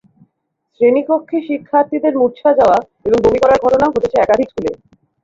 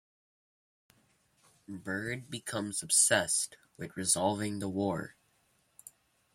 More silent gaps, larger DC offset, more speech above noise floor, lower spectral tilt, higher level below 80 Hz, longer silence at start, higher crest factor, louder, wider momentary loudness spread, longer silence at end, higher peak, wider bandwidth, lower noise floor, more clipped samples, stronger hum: neither; neither; first, 56 dB vs 40 dB; first, -6.5 dB/octave vs -2.5 dB/octave; first, -44 dBFS vs -72 dBFS; second, 0.8 s vs 1.7 s; second, 14 dB vs 24 dB; first, -14 LUFS vs -30 LUFS; second, 8 LU vs 20 LU; second, 0.5 s vs 1.25 s; first, -2 dBFS vs -12 dBFS; second, 7.8 kHz vs 16.5 kHz; about the same, -69 dBFS vs -72 dBFS; neither; neither